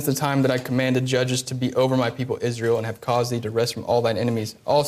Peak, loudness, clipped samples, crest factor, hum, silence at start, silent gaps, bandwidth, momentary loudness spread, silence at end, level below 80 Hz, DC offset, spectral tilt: -8 dBFS; -23 LUFS; under 0.1%; 14 dB; none; 0 s; none; 15.5 kHz; 4 LU; 0 s; -62 dBFS; under 0.1%; -5.5 dB/octave